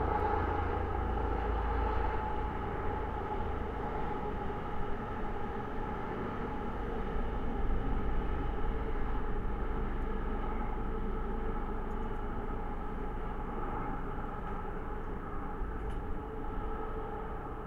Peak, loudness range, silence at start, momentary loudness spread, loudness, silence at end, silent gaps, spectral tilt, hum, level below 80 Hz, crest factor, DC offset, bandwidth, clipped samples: -18 dBFS; 5 LU; 0 s; 6 LU; -38 LUFS; 0 s; none; -8.5 dB/octave; none; -36 dBFS; 16 dB; under 0.1%; 4.5 kHz; under 0.1%